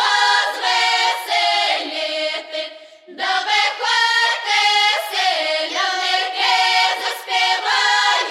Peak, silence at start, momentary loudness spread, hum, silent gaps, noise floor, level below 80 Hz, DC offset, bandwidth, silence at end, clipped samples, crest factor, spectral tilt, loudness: -4 dBFS; 0 s; 8 LU; none; none; -40 dBFS; -72 dBFS; under 0.1%; 16 kHz; 0 s; under 0.1%; 14 dB; 2.5 dB/octave; -16 LUFS